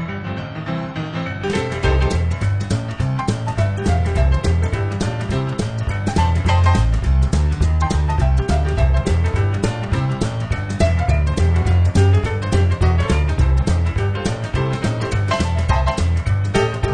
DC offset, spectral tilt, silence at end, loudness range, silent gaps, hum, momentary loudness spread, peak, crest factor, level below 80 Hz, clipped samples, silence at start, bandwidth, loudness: under 0.1%; -6.5 dB/octave; 0 s; 3 LU; none; none; 7 LU; -4 dBFS; 14 dB; -22 dBFS; under 0.1%; 0 s; 10 kHz; -19 LUFS